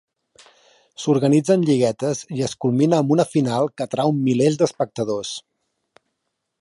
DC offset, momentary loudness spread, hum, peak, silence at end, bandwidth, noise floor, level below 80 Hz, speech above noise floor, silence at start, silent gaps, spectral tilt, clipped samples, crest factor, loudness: under 0.1%; 9 LU; none; -4 dBFS; 1.2 s; 11.5 kHz; -77 dBFS; -64 dBFS; 58 dB; 1 s; none; -6.5 dB/octave; under 0.1%; 18 dB; -20 LUFS